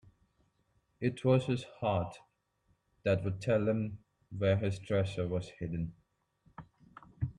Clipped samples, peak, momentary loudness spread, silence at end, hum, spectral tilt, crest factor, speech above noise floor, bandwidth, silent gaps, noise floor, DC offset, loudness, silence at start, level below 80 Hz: under 0.1%; -16 dBFS; 14 LU; 0.05 s; none; -7.5 dB/octave; 18 dB; 43 dB; 10.5 kHz; none; -75 dBFS; under 0.1%; -34 LUFS; 1 s; -60 dBFS